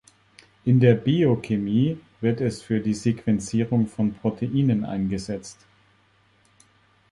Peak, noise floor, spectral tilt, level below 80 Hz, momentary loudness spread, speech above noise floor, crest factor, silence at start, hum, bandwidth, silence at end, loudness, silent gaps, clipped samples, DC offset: -4 dBFS; -61 dBFS; -7.5 dB/octave; -54 dBFS; 9 LU; 39 dB; 20 dB; 0.65 s; none; 11.5 kHz; 1.6 s; -23 LUFS; none; under 0.1%; under 0.1%